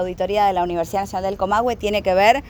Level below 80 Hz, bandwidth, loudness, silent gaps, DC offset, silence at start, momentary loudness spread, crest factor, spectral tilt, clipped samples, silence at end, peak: -42 dBFS; over 20 kHz; -20 LUFS; none; under 0.1%; 0 s; 7 LU; 18 dB; -4.5 dB/octave; under 0.1%; 0 s; -2 dBFS